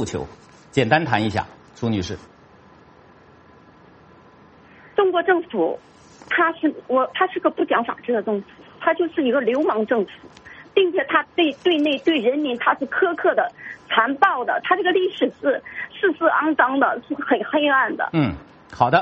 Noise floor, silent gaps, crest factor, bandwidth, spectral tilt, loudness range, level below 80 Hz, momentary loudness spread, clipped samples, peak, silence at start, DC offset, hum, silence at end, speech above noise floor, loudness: -49 dBFS; none; 20 dB; 8.4 kHz; -6 dB/octave; 6 LU; -56 dBFS; 9 LU; under 0.1%; 0 dBFS; 0 s; under 0.1%; none; 0 s; 29 dB; -21 LUFS